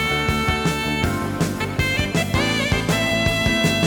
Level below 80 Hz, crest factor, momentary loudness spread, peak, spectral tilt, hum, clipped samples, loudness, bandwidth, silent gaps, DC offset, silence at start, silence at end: -34 dBFS; 14 dB; 4 LU; -6 dBFS; -4.5 dB/octave; none; under 0.1%; -20 LUFS; over 20 kHz; none; under 0.1%; 0 s; 0 s